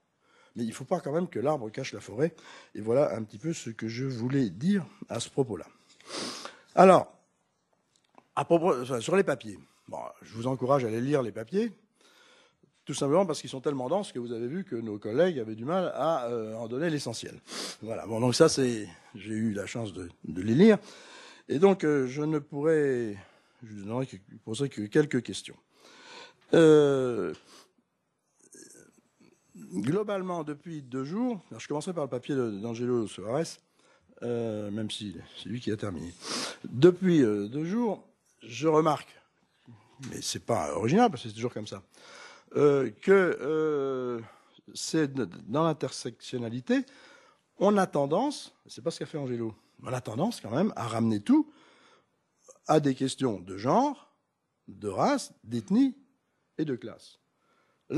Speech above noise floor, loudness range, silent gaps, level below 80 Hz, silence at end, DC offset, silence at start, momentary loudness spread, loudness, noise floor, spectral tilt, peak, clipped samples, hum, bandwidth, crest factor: 50 dB; 7 LU; none; -70 dBFS; 0 s; under 0.1%; 0.55 s; 18 LU; -29 LUFS; -78 dBFS; -6 dB/octave; -4 dBFS; under 0.1%; none; 13 kHz; 24 dB